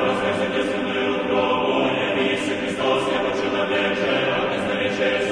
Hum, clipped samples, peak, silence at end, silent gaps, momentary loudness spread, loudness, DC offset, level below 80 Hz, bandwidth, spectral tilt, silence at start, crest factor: none; under 0.1%; -6 dBFS; 0 s; none; 3 LU; -21 LUFS; under 0.1%; -54 dBFS; 10.5 kHz; -4.5 dB/octave; 0 s; 14 dB